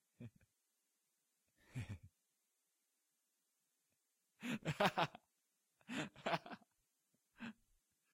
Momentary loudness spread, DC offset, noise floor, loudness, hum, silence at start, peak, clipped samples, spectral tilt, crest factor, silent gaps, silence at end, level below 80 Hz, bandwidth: 20 LU; under 0.1%; -86 dBFS; -44 LUFS; none; 0.2 s; -20 dBFS; under 0.1%; -5 dB/octave; 28 dB; none; 0.6 s; -78 dBFS; 16 kHz